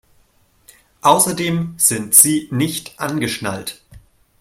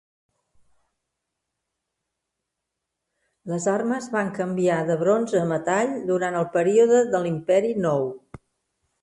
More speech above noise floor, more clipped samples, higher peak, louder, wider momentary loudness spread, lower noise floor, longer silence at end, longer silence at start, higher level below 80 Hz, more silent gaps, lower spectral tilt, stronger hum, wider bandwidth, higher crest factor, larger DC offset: second, 40 dB vs 61 dB; neither; first, 0 dBFS vs -8 dBFS; first, -15 LUFS vs -22 LUFS; first, 15 LU vs 8 LU; second, -57 dBFS vs -83 dBFS; second, 0.4 s vs 0.85 s; second, 1.05 s vs 3.45 s; first, -54 dBFS vs -66 dBFS; neither; second, -3 dB/octave vs -6 dB/octave; neither; first, 16.5 kHz vs 11.5 kHz; about the same, 18 dB vs 16 dB; neither